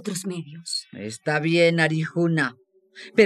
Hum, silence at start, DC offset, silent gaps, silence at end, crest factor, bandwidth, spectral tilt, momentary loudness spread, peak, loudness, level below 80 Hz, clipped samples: none; 0 s; under 0.1%; none; 0 s; 20 dB; 13 kHz; -5 dB/octave; 14 LU; -4 dBFS; -23 LUFS; -72 dBFS; under 0.1%